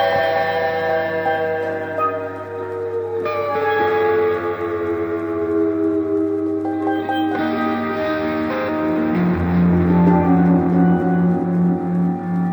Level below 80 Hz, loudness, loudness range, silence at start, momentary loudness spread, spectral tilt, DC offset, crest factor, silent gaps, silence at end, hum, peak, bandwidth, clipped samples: -46 dBFS; -19 LUFS; 5 LU; 0 s; 8 LU; -9 dB/octave; under 0.1%; 14 dB; none; 0 s; none; -4 dBFS; over 20 kHz; under 0.1%